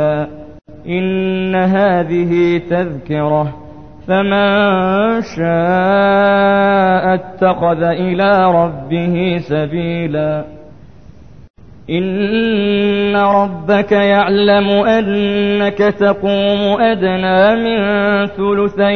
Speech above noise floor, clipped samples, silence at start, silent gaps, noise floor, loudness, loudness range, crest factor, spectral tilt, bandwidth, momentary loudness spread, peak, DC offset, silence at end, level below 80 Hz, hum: 26 dB; under 0.1%; 0 s; 11.50-11.54 s; -39 dBFS; -13 LUFS; 5 LU; 14 dB; -8 dB/octave; 6.4 kHz; 7 LU; 0 dBFS; 0.9%; 0 s; -44 dBFS; none